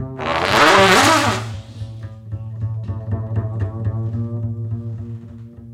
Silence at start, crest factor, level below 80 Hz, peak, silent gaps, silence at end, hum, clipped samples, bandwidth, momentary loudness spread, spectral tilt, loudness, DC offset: 0 s; 18 dB; -42 dBFS; 0 dBFS; none; 0 s; none; under 0.1%; 16.5 kHz; 22 LU; -4 dB/octave; -17 LUFS; under 0.1%